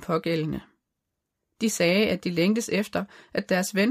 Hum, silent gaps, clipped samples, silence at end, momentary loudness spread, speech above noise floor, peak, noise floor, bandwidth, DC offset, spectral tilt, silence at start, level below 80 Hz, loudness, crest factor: none; none; under 0.1%; 0 s; 11 LU; 57 dB; -8 dBFS; -82 dBFS; 15.5 kHz; under 0.1%; -4.5 dB/octave; 0 s; -58 dBFS; -25 LUFS; 18 dB